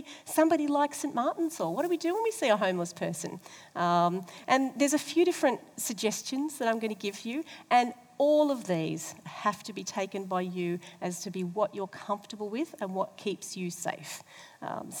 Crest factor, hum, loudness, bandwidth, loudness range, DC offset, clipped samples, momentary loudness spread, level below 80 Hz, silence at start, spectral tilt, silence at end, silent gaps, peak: 22 dB; none; -30 LUFS; over 20 kHz; 6 LU; under 0.1%; under 0.1%; 12 LU; -84 dBFS; 0 s; -4.5 dB/octave; 0 s; none; -10 dBFS